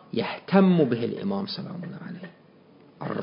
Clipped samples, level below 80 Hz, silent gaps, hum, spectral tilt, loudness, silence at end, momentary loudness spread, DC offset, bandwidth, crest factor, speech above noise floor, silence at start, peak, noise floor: under 0.1%; -68 dBFS; none; none; -11.5 dB/octave; -25 LUFS; 0 s; 20 LU; under 0.1%; 5.4 kHz; 22 dB; 30 dB; 0.15 s; -4 dBFS; -54 dBFS